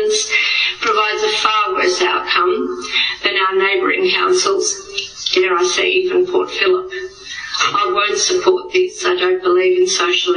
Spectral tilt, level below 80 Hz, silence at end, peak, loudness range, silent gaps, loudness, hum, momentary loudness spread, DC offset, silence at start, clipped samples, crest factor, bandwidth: -1 dB/octave; -56 dBFS; 0 s; 0 dBFS; 1 LU; none; -15 LUFS; none; 5 LU; under 0.1%; 0 s; under 0.1%; 16 dB; 10 kHz